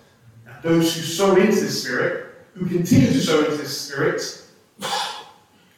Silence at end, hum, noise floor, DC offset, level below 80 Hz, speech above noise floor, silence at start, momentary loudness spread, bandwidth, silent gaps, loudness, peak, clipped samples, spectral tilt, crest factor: 0.5 s; none; -52 dBFS; under 0.1%; -54 dBFS; 32 dB; 0.45 s; 15 LU; 18 kHz; none; -20 LUFS; -4 dBFS; under 0.1%; -5 dB/octave; 18 dB